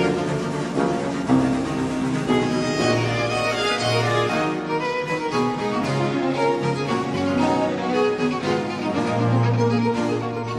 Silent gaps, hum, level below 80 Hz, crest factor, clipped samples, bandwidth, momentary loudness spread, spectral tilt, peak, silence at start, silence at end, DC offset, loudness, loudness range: none; none; -50 dBFS; 16 dB; under 0.1%; 12.5 kHz; 4 LU; -6 dB/octave; -6 dBFS; 0 s; 0 s; under 0.1%; -22 LUFS; 1 LU